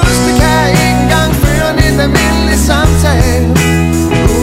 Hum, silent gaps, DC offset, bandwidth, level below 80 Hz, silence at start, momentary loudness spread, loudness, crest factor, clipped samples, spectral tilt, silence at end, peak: none; none; under 0.1%; 16.5 kHz; -16 dBFS; 0 s; 2 LU; -9 LUFS; 8 dB; 0.3%; -5 dB/octave; 0 s; 0 dBFS